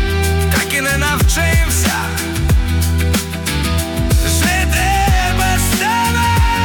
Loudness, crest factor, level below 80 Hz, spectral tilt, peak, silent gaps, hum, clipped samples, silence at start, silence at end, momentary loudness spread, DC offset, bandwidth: -15 LUFS; 10 dB; -20 dBFS; -4 dB/octave; -4 dBFS; none; none; under 0.1%; 0 s; 0 s; 4 LU; under 0.1%; 19 kHz